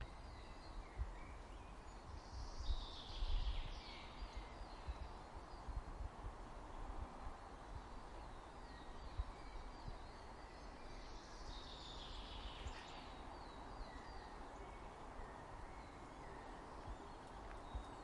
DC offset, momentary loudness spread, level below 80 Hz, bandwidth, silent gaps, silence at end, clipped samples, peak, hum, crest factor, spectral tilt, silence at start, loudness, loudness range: under 0.1%; 7 LU; -52 dBFS; 11 kHz; none; 0 s; under 0.1%; -30 dBFS; none; 20 dB; -5 dB/octave; 0 s; -54 LUFS; 4 LU